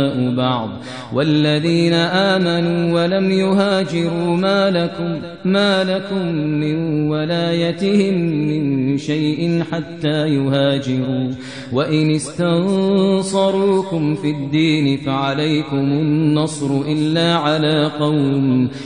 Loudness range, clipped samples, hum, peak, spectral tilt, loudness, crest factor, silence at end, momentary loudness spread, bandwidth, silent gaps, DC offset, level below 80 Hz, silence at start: 2 LU; under 0.1%; none; -2 dBFS; -6.5 dB/octave; -17 LUFS; 16 dB; 0 s; 5 LU; 10 kHz; none; 0.3%; -58 dBFS; 0 s